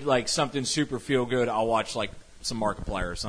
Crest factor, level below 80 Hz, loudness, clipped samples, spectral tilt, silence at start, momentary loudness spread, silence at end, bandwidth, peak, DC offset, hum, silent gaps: 18 dB; -44 dBFS; -27 LUFS; under 0.1%; -4 dB/octave; 0 s; 8 LU; 0 s; 11 kHz; -10 dBFS; under 0.1%; none; none